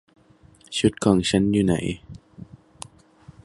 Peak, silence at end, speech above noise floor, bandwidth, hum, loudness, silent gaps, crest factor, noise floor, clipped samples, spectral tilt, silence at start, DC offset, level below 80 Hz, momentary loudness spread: -4 dBFS; 1 s; 33 dB; 11.5 kHz; none; -22 LUFS; none; 22 dB; -54 dBFS; under 0.1%; -5.5 dB/octave; 0.7 s; under 0.1%; -46 dBFS; 22 LU